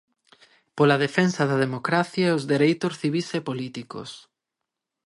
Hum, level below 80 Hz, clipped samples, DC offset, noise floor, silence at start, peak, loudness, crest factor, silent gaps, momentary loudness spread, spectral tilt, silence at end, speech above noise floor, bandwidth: none; -70 dBFS; under 0.1%; under 0.1%; -85 dBFS; 0.75 s; -6 dBFS; -23 LUFS; 20 dB; none; 15 LU; -6 dB/octave; 0.85 s; 62 dB; 11.5 kHz